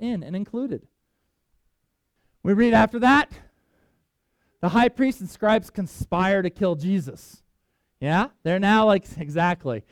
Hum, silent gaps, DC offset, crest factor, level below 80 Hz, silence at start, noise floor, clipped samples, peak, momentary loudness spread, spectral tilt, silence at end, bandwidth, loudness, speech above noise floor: none; none; under 0.1%; 20 dB; -50 dBFS; 0 s; -74 dBFS; under 0.1%; -4 dBFS; 13 LU; -6.5 dB/octave; 0.1 s; 15 kHz; -22 LUFS; 52 dB